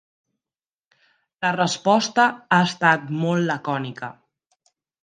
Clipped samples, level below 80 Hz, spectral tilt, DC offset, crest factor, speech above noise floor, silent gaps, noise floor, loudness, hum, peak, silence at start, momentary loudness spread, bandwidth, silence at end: under 0.1%; -70 dBFS; -4.5 dB/octave; under 0.1%; 22 dB; over 69 dB; none; under -90 dBFS; -21 LUFS; none; -2 dBFS; 1.4 s; 11 LU; 9.6 kHz; 0.9 s